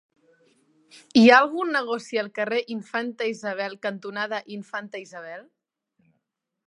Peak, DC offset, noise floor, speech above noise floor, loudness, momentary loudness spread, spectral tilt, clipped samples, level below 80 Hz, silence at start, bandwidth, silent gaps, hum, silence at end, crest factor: -2 dBFS; under 0.1%; -79 dBFS; 55 dB; -23 LUFS; 22 LU; -4.5 dB/octave; under 0.1%; -76 dBFS; 1.15 s; 10.5 kHz; none; none; 1.25 s; 24 dB